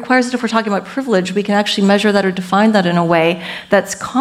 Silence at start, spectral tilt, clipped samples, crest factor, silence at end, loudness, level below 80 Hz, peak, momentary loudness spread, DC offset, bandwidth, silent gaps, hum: 0 s; -5 dB/octave; under 0.1%; 14 dB; 0 s; -15 LUFS; -56 dBFS; 0 dBFS; 5 LU; under 0.1%; 14.5 kHz; none; none